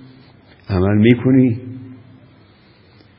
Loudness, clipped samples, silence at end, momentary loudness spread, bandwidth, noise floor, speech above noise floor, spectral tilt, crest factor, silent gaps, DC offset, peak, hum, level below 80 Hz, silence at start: -15 LUFS; under 0.1%; 1.25 s; 19 LU; 5.2 kHz; -49 dBFS; 35 dB; -11.5 dB/octave; 18 dB; none; under 0.1%; 0 dBFS; none; -38 dBFS; 0.7 s